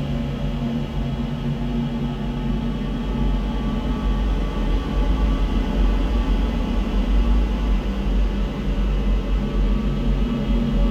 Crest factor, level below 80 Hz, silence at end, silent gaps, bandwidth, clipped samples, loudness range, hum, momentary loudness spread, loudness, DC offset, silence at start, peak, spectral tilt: 12 dB; -22 dBFS; 0 s; none; 6.8 kHz; under 0.1%; 2 LU; none; 4 LU; -24 LUFS; under 0.1%; 0 s; -8 dBFS; -7.5 dB/octave